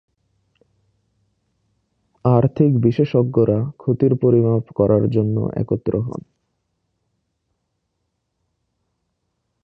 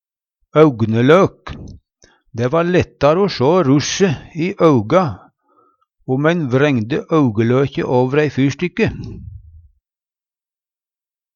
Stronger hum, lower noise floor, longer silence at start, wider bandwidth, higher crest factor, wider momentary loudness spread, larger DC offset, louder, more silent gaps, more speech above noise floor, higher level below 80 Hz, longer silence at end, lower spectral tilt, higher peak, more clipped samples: neither; second, -74 dBFS vs under -90 dBFS; first, 2.25 s vs 0.55 s; second, 5.8 kHz vs 7.2 kHz; about the same, 20 dB vs 16 dB; second, 7 LU vs 18 LU; neither; second, -18 LUFS vs -15 LUFS; neither; second, 57 dB vs over 75 dB; about the same, -50 dBFS vs -46 dBFS; first, 3.45 s vs 2 s; first, -11.5 dB/octave vs -6.5 dB/octave; about the same, -2 dBFS vs 0 dBFS; neither